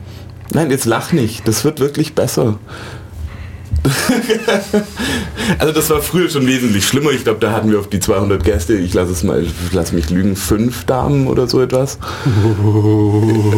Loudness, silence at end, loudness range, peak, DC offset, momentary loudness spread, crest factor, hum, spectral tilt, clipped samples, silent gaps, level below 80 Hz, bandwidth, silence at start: -15 LUFS; 0 s; 3 LU; -2 dBFS; under 0.1%; 7 LU; 12 dB; none; -5.5 dB/octave; under 0.1%; none; -30 dBFS; 17 kHz; 0 s